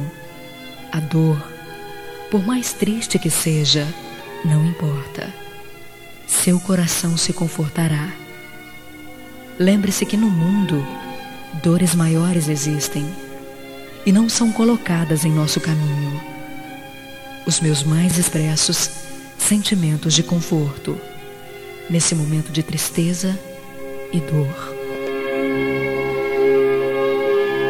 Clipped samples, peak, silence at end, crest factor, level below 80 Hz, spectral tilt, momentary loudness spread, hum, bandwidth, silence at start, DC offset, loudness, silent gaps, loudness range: under 0.1%; -4 dBFS; 0 s; 16 dB; -52 dBFS; -4.5 dB/octave; 19 LU; none; 16.5 kHz; 0 s; under 0.1%; -19 LUFS; none; 4 LU